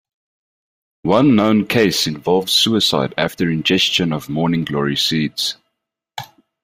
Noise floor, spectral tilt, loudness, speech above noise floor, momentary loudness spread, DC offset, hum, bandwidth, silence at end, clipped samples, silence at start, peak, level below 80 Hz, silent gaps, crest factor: -77 dBFS; -4.5 dB/octave; -16 LUFS; 60 dB; 12 LU; under 0.1%; none; 16 kHz; 0.4 s; under 0.1%; 1.05 s; 0 dBFS; -52 dBFS; none; 18 dB